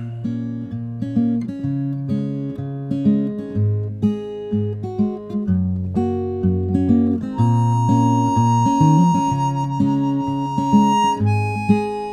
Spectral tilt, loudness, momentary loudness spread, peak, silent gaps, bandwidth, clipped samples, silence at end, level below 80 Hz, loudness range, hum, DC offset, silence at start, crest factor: -8 dB/octave; -19 LUFS; 10 LU; -4 dBFS; none; 11 kHz; under 0.1%; 0 s; -48 dBFS; 6 LU; none; under 0.1%; 0 s; 16 dB